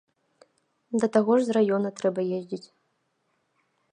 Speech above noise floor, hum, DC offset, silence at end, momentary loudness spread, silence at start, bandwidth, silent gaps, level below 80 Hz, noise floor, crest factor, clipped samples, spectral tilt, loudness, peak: 49 dB; none; under 0.1%; 1.35 s; 12 LU; 0.9 s; 10 kHz; none; -76 dBFS; -74 dBFS; 20 dB; under 0.1%; -6.5 dB/octave; -25 LUFS; -8 dBFS